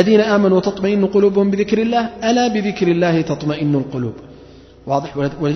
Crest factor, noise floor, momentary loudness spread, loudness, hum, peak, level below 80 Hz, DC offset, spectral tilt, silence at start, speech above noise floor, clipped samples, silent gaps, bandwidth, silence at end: 16 dB; -41 dBFS; 9 LU; -17 LUFS; none; 0 dBFS; -48 dBFS; under 0.1%; -6.5 dB/octave; 0 s; 26 dB; under 0.1%; none; 6.4 kHz; 0 s